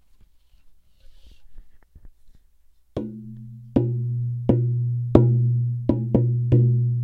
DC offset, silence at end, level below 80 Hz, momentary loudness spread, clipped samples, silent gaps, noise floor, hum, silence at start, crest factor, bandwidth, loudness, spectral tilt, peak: under 0.1%; 0 s; -42 dBFS; 17 LU; under 0.1%; none; -54 dBFS; none; 0.65 s; 22 dB; 3.9 kHz; -22 LUFS; -12 dB/octave; 0 dBFS